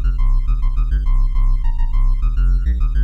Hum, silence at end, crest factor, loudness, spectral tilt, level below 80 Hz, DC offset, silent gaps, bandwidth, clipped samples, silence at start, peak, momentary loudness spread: none; 0 s; 6 dB; -21 LUFS; -8 dB/octave; -14 dBFS; under 0.1%; none; 3.3 kHz; under 0.1%; 0 s; -8 dBFS; 3 LU